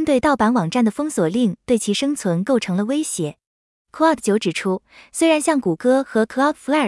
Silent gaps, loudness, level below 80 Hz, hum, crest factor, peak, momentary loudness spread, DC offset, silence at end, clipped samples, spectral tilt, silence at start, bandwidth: 3.47-3.85 s; -19 LUFS; -56 dBFS; none; 14 dB; -4 dBFS; 7 LU; under 0.1%; 0 s; under 0.1%; -5 dB/octave; 0 s; 12 kHz